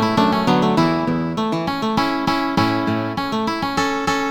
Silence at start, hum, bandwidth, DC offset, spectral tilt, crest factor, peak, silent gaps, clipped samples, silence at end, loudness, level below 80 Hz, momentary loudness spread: 0 s; none; 19.5 kHz; under 0.1%; -5.5 dB/octave; 14 dB; -4 dBFS; none; under 0.1%; 0 s; -19 LUFS; -46 dBFS; 5 LU